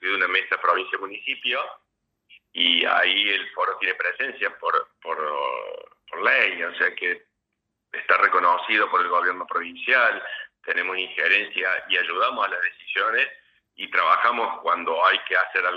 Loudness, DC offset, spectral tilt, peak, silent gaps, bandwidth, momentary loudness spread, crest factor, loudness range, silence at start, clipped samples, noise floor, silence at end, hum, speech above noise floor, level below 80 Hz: -22 LUFS; under 0.1%; -3 dB/octave; -4 dBFS; none; 7 kHz; 11 LU; 20 dB; 3 LU; 0 s; under 0.1%; -80 dBFS; 0 s; none; 57 dB; -78 dBFS